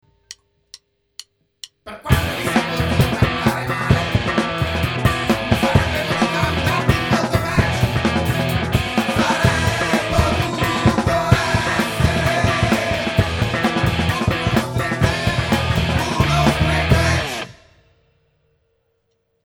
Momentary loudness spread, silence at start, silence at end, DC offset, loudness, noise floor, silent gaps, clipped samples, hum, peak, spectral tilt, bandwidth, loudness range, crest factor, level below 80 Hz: 4 LU; 0.3 s; 2 s; under 0.1%; -18 LUFS; -68 dBFS; none; under 0.1%; none; 0 dBFS; -5.5 dB/octave; over 20 kHz; 2 LU; 18 dB; -30 dBFS